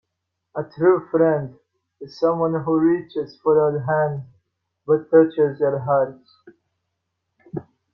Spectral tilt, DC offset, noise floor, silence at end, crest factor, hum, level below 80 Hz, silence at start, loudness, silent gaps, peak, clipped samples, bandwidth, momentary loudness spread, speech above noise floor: -10 dB/octave; under 0.1%; -79 dBFS; 0.3 s; 18 dB; none; -64 dBFS; 0.55 s; -20 LUFS; none; -4 dBFS; under 0.1%; 6 kHz; 18 LU; 59 dB